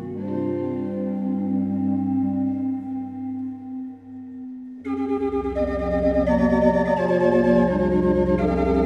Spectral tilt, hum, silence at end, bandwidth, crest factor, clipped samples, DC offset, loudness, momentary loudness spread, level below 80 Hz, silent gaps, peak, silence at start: -9.5 dB/octave; none; 0 s; 7.8 kHz; 18 dB; under 0.1%; under 0.1%; -22 LUFS; 16 LU; -38 dBFS; none; -4 dBFS; 0 s